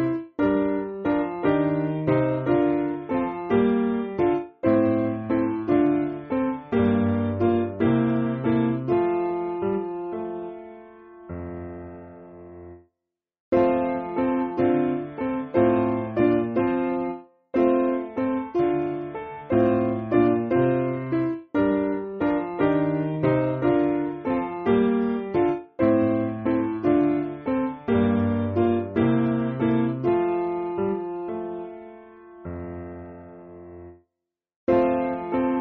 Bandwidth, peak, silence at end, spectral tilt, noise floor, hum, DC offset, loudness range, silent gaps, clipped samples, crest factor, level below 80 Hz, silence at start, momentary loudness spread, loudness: 4.3 kHz; -8 dBFS; 0 s; -7.5 dB/octave; -84 dBFS; none; under 0.1%; 7 LU; 13.40-13.52 s, 34.56-34.67 s; under 0.1%; 16 dB; -54 dBFS; 0 s; 15 LU; -24 LUFS